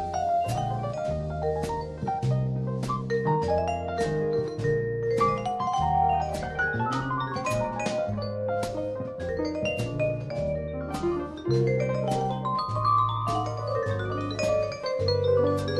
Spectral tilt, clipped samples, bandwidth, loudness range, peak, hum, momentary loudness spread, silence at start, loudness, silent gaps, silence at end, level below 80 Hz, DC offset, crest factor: -6.5 dB/octave; under 0.1%; 13 kHz; 3 LU; -12 dBFS; none; 6 LU; 0 s; -28 LUFS; none; 0 s; -44 dBFS; under 0.1%; 14 dB